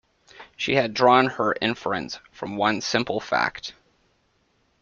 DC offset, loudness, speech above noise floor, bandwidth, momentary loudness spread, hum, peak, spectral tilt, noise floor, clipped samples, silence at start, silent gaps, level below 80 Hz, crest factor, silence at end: under 0.1%; -23 LUFS; 44 dB; 7.4 kHz; 16 LU; none; -4 dBFS; -4.5 dB/octave; -67 dBFS; under 0.1%; 0.4 s; none; -60 dBFS; 22 dB; 1.1 s